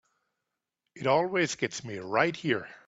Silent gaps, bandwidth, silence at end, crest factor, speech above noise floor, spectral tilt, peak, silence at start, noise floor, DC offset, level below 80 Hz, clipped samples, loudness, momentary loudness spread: none; 8 kHz; 0.1 s; 22 dB; 57 dB; -4.5 dB/octave; -8 dBFS; 0.95 s; -86 dBFS; under 0.1%; -70 dBFS; under 0.1%; -29 LUFS; 8 LU